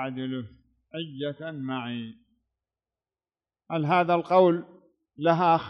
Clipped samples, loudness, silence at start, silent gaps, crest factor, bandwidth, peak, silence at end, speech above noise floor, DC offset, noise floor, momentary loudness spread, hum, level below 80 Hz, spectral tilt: under 0.1%; -26 LUFS; 0 s; none; 20 dB; 6.2 kHz; -8 dBFS; 0 s; over 65 dB; under 0.1%; under -90 dBFS; 17 LU; none; -72 dBFS; -8.5 dB/octave